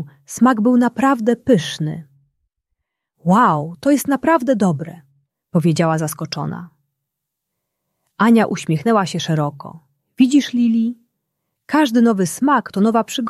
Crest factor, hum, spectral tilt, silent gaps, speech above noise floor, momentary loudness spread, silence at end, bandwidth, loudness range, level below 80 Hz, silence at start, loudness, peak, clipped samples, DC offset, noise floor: 16 dB; none; -6 dB/octave; none; 63 dB; 12 LU; 0 s; 14 kHz; 3 LU; -60 dBFS; 0 s; -17 LUFS; -2 dBFS; under 0.1%; under 0.1%; -79 dBFS